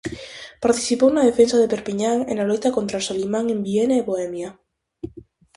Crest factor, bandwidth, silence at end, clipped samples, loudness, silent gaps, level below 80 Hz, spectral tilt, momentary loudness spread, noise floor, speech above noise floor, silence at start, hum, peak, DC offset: 18 dB; 11.5 kHz; 0.35 s; under 0.1%; -20 LUFS; none; -54 dBFS; -4.5 dB/octave; 19 LU; -45 dBFS; 25 dB; 0.05 s; none; -2 dBFS; under 0.1%